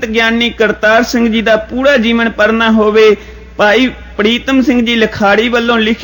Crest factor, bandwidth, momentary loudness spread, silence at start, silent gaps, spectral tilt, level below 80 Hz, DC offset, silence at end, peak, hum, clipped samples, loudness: 10 dB; 17 kHz; 4 LU; 0 s; none; -4.5 dB/octave; -34 dBFS; under 0.1%; 0 s; 0 dBFS; none; under 0.1%; -10 LUFS